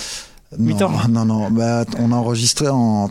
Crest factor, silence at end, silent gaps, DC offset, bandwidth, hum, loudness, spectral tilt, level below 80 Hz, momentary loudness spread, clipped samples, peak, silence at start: 14 dB; 0 s; none; under 0.1%; 15 kHz; none; -17 LUFS; -5.5 dB/octave; -46 dBFS; 7 LU; under 0.1%; -4 dBFS; 0 s